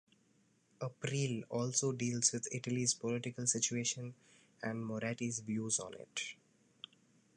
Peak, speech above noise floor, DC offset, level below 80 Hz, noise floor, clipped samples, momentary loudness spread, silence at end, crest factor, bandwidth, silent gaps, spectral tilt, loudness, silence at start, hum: -16 dBFS; 35 dB; under 0.1%; -78 dBFS; -73 dBFS; under 0.1%; 13 LU; 1.05 s; 22 dB; 11 kHz; none; -3.5 dB/octave; -37 LUFS; 0.8 s; none